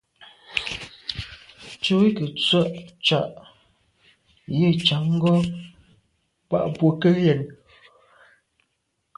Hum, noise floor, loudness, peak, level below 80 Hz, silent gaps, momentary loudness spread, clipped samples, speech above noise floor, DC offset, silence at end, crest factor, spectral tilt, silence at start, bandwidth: none; -74 dBFS; -22 LUFS; -4 dBFS; -56 dBFS; none; 15 LU; under 0.1%; 54 dB; under 0.1%; 1.65 s; 22 dB; -6.5 dB/octave; 0.2 s; 11 kHz